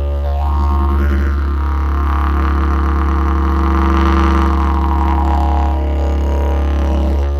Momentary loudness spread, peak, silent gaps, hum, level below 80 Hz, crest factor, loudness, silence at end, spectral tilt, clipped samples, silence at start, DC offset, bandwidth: 4 LU; 0 dBFS; none; none; -16 dBFS; 14 dB; -15 LUFS; 0 s; -8.5 dB/octave; under 0.1%; 0 s; under 0.1%; 6.2 kHz